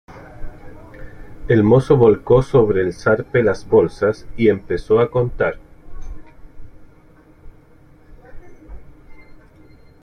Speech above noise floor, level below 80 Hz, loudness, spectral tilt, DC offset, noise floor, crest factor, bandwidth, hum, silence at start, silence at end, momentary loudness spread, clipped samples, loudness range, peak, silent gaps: 32 dB; -38 dBFS; -16 LUFS; -8.5 dB/octave; under 0.1%; -47 dBFS; 18 dB; 10 kHz; none; 0.1 s; 0.7 s; 25 LU; under 0.1%; 8 LU; 0 dBFS; none